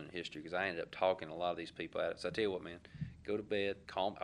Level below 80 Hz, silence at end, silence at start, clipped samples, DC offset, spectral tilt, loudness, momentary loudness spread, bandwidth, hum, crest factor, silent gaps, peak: -66 dBFS; 0 s; 0 s; under 0.1%; under 0.1%; -5.5 dB/octave; -39 LUFS; 10 LU; 11 kHz; none; 20 dB; none; -20 dBFS